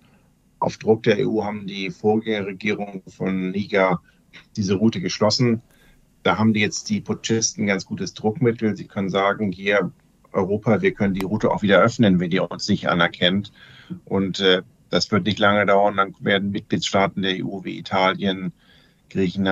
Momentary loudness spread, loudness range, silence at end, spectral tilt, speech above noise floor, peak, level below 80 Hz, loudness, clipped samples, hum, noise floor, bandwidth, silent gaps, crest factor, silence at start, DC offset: 10 LU; 3 LU; 0 s; -5 dB/octave; 37 dB; -2 dBFS; -58 dBFS; -21 LUFS; under 0.1%; none; -57 dBFS; 8.2 kHz; none; 20 dB; 0.6 s; under 0.1%